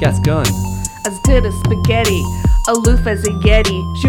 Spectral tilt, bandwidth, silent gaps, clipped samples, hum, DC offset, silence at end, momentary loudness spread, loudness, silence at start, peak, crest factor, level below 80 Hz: -5 dB/octave; 18 kHz; none; under 0.1%; none; under 0.1%; 0 s; 6 LU; -15 LUFS; 0 s; 0 dBFS; 14 dB; -18 dBFS